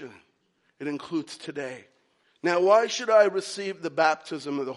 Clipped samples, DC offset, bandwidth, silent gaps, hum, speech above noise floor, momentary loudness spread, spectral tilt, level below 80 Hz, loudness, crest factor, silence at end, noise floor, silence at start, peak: under 0.1%; under 0.1%; 11.5 kHz; none; none; 45 dB; 16 LU; -4 dB/octave; -82 dBFS; -25 LUFS; 20 dB; 0 s; -70 dBFS; 0 s; -6 dBFS